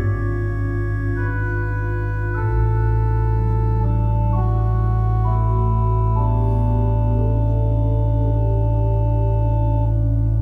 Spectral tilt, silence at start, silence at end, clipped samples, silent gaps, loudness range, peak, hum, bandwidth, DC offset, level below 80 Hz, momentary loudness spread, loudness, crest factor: -11 dB/octave; 0 s; 0 s; under 0.1%; none; 2 LU; -8 dBFS; none; 2.8 kHz; under 0.1%; -22 dBFS; 4 LU; -20 LUFS; 10 dB